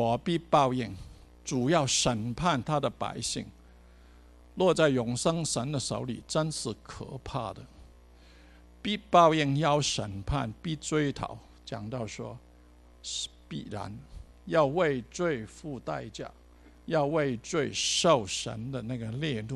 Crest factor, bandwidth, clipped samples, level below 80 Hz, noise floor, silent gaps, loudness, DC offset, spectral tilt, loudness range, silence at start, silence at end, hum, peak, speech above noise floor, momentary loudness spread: 24 dB; 12.5 kHz; under 0.1%; -52 dBFS; -55 dBFS; none; -29 LUFS; under 0.1%; -4.5 dB/octave; 8 LU; 0 s; 0 s; 60 Hz at -55 dBFS; -6 dBFS; 26 dB; 17 LU